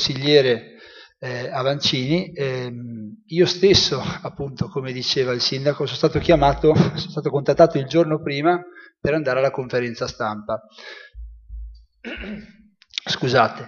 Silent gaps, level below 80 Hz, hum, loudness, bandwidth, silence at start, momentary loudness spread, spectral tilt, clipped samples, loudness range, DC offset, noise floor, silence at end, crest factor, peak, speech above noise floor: none; -42 dBFS; none; -20 LUFS; 7.2 kHz; 0 s; 19 LU; -5 dB/octave; under 0.1%; 8 LU; under 0.1%; -46 dBFS; 0 s; 20 dB; 0 dBFS; 25 dB